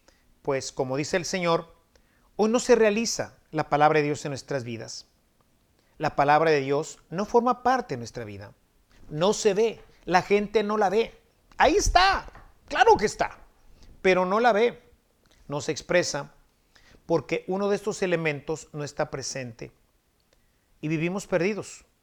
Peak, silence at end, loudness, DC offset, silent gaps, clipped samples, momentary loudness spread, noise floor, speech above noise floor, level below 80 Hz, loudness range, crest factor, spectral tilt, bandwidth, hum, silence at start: -4 dBFS; 0.25 s; -25 LUFS; under 0.1%; none; under 0.1%; 15 LU; -67 dBFS; 42 dB; -46 dBFS; 7 LU; 22 dB; -4.5 dB/octave; 14.5 kHz; none; 0.45 s